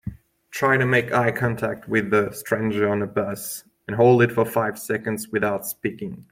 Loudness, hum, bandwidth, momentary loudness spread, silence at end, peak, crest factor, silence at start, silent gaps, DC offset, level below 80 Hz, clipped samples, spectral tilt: -22 LUFS; none; 16.5 kHz; 13 LU; 0.1 s; -4 dBFS; 18 dB; 0.05 s; none; under 0.1%; -56 dBFS; under 0.1%; -6 dB/octave